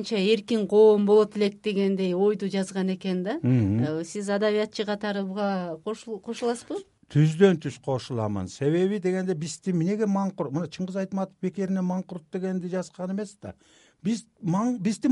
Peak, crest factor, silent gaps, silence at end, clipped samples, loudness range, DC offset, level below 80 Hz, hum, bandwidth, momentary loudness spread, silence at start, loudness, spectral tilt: -6 dBFS; 18 dB; none; 0 s; under 0.1%; 7 LU; under 0.1%; -66 dBFS; none; 11.5 kHz; 12 LU; 0 s; -26 LUFS; -7 dB/octave